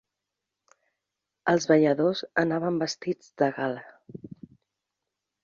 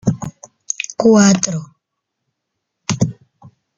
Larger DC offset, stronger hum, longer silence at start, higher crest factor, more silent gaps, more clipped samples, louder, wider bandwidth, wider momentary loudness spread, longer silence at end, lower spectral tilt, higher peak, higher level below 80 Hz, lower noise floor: neither; neither; first, 1.45 s vs 0.05 s; about the same, 22 dB vs 18 dB; neither; neither; second, -26 LUFS vs -16 LUFS; second, 7.4 kHz vs 9.4 kHz; first, 23 LU vs 17 LU; first, 1.15 s vs 0.65 s; about the same, -5.5 dB/octave vs -5 dB/octave; second, -6 dBFS vs 0 dBFS; second, -70 dBFS vs -50 dBFS; first, -86 dBFS vs -77 dBFS